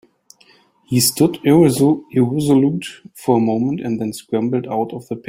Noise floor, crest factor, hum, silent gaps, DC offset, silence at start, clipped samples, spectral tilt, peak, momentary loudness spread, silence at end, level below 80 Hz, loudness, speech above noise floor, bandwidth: -53 dBFS; 16 dB; none; none; under 0.1%; 0.9 s; under 0.1%; -5.5 dB/octave; -2 dBFS; 11 LU; 0.1 s; -54 dBFS; -17 LUFS; 36 dB; 16.5 kHz